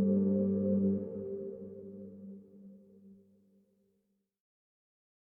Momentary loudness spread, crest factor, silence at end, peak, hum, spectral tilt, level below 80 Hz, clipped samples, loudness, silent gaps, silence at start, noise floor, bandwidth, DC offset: 24 LU; 16 dB; 2.2 s; -20 dBFS; none; -14.5 dB/octave; -76 dBFS; under 0.1%; -33 LUFS; none; 0 s; -79 dBFS; 1.6 kHz; under 0.1%